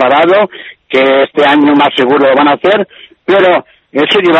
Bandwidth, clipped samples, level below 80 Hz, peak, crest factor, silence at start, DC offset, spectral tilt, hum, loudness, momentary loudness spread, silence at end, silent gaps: 8.2 kHz; 0.1%; -54 dBFS; 0 dBFS; 8 dB; 0 s; under 0.1%; -6 dB/octave; none; -9 LUFS; 10 LU; 0 s; none